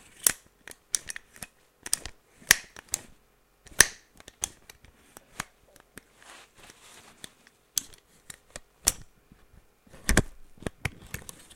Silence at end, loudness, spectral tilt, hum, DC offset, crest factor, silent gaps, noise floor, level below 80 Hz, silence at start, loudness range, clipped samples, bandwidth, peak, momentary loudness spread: 0.35 s; -28 LUFS; -1 dB/octave; none; under 0.1%; 34 dB; none; -64 dBFS; -44 dBFS; 0.25 s; 14 LU; under 0.1%; 16.5 kHz; 0 dBFS; 27 LU